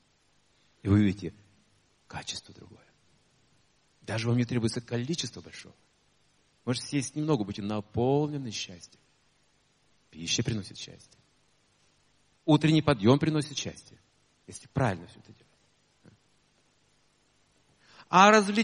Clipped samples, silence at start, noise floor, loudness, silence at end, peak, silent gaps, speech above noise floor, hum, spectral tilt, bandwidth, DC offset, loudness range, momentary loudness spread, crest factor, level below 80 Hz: under 0.1%; 0.85 s; -69 dBFS; -28 LUFS; 0 s; -4 dBFS; none; 41 dB; none; -5 dB/octave; 11.5 kHz; under 0.1%; 10 LU; 20 LU; 26 dB; -62 dBFS